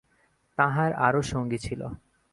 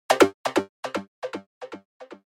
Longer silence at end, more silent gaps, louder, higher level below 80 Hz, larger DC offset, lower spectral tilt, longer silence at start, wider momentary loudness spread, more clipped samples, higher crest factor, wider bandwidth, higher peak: first, 0.35 s vs 0.1 s; second, none vs 0.34-0.44 s, 0.69-0.83 s, 1.08-1.22 s, 1.46-1.61 s, 1.85-2.00 s; about the same, -27 LUFS vs -25 LUFS; first, -52 dBFS vs -70 dBFS; neither; first, -6 dB/octave vs -3.5 dB/octave; first, 0.6 s vs 0.1 s; second, 14 LU vs 22 LU; neither; about the same, 20 dB vs 24 dB; second, 11.5 kHz vs 16.5 kHz; second, -6 dBFS vs -2 dBFS